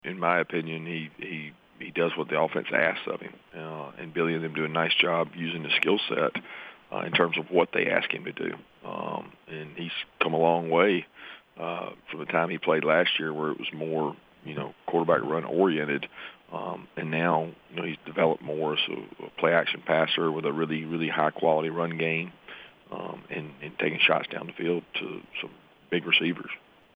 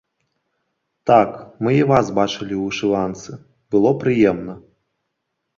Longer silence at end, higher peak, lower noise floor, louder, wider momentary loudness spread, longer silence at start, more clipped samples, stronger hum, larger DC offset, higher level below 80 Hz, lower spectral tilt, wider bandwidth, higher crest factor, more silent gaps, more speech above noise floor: second, 0.35 s vs 1 s; second, -6 dBFS vs -2 dBFS; second, -48 dBFS vs -76 dBFS; second, -27 LUFS vs -18 LUFS; first, 16 LU vs 13 LU; second, 0.05 s vs 1.05 s; neither; neither; neither; second, -74 dBFS vs -52 dBFS; about the same, -7 dB/octave vs -6.5 dB/octave; second, 5 kHz vs 7.4 kHz; about the same, 22 dB vs 18 dB; neither; second, 20 dB vs 59 dB